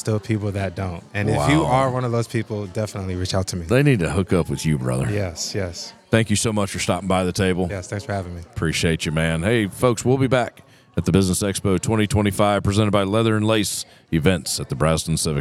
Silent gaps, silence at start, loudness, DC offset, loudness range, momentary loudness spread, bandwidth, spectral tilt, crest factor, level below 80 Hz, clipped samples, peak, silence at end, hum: none; 0.05 s; -21 LUFS; under 0.1%; 2 LU; 9 LU; 15.5 kHz; -5.5 dB/octave; 20 dB; -44 dBFS; under 0.1%; -2 dBFS; 0 s; none